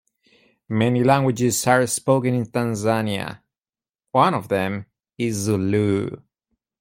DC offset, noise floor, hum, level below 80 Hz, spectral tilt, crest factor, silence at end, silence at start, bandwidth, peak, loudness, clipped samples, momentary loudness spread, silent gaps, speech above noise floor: under 0.1%; under -90 dBFS; none; -58 dBFS; -5.5 dB/octave; 18 dB; 0.65 s; 0.7 s; 16.5 kHz; -4 dBFS; -21 LUFS; under 0.1%; 10 LU; none; over 70 dB